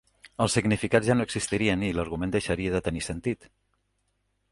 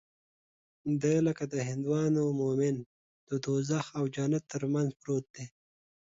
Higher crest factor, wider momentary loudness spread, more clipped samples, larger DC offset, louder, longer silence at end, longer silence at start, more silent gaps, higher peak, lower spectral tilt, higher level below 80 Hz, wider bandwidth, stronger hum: first, 22 dB vs 16 dB; about the same, 8 LU vs 10 LU; neither; neither; first, -27 LUFS vs -31 LUFS; first, 1.15 s vs 0.55 s; second, 0.25 s vs 0.85 s; second, none vs 2.86-3.27 s, 5.30-5.34 s; first, -6 dBFS vs -16 dBFS; second, -5 dB/octave vs -7 dB/octave; first, -46 dBFS vs -68 dBFS; first, 11.5 kHz vs 7.8 kHz; first, 50 Hz at -50 dBFS vs none